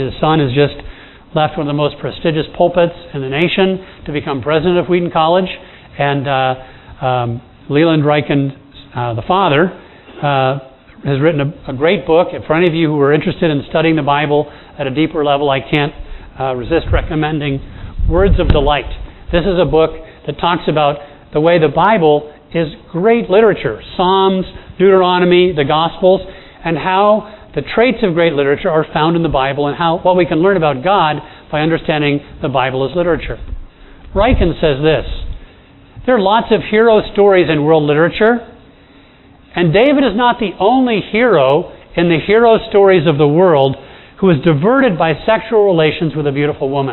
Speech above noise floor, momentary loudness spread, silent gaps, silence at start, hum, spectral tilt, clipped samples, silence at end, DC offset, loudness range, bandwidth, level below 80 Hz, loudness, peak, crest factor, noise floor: 31 dB; 12 LU; none; 0 s; none; -10 dB/octave; under 0.1%; 0 s; under 0.1%; 4 LU; 4.2 kHz; -30 dBFS; -13 LUFS; 0 dBFS; 14 dB; -43 dBFS